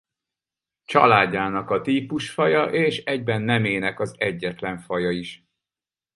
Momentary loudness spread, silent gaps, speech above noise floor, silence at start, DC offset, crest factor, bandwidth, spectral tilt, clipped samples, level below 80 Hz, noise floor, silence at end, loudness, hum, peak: 11 LU; none; over 68 dB; 0.9 s; under 0.1%; 22 dB; 11.5 kHz; -6 dB/octave; under 0.1%; -58 dBFS; under -90 dBFS; 0.8 s; -22 LUFS; none; 0 dBFS